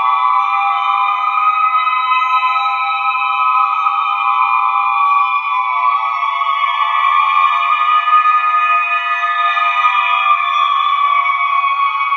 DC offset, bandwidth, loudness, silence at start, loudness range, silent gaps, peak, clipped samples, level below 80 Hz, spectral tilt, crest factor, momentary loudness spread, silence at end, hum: under 0.1%; 6.8 kHz; -13 LUFS; 0 s; 1 LU; none; 0 dBFS; under 0.1%; under -90 dBFS; 5.5 dB/octave; 14 dB; 3 LU; 0 s; none